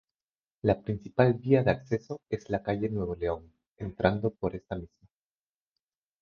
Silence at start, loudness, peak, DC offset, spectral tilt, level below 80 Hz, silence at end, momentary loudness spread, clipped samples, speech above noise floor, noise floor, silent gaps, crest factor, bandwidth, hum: 0.65 s; -30 LUFS; -8 dBFS; under 0.1%; -8.5 dB/octave; -52 dBFS; 1.35 s; 14 LU; under 0.1%; over 61 dB; under -90 dBFS; 3.67-3.76 s; 22 dB; 6.8 kHz; none